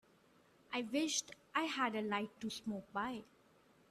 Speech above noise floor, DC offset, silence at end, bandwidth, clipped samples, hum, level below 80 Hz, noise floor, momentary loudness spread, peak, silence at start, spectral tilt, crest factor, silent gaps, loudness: 29 dB; under 0.1%; 0.65 s; 14 kHz; under 0.1%; none; -80 dBFS; -69 dBFS; 8 LU; -20 dBFS; 0.7 s; -2.5 dB/octave; 22 dB; none; -40 LUFS